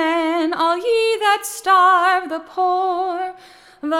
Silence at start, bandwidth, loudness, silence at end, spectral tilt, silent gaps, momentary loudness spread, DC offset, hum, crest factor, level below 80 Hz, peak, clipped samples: 0 s; 17 kHz; -17 LUFS; 0 s; -1 dB/octave; none; 13 LU; under 0.1%; none; 14 dB; -64 dBFS; -4 dBFS; under 0.1%